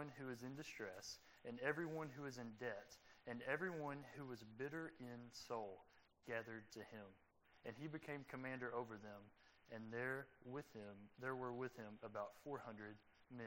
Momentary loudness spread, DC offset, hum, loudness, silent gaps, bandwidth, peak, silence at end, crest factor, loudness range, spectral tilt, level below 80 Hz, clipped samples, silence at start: 12 LU; under 0.1%; none; -51 LUFS; none; 16 kHz; -28 dBFS; 0 s; 24 dB; 4 LU; -5.5 dB/octave; -84 dBFS; under 0.1%; 0 s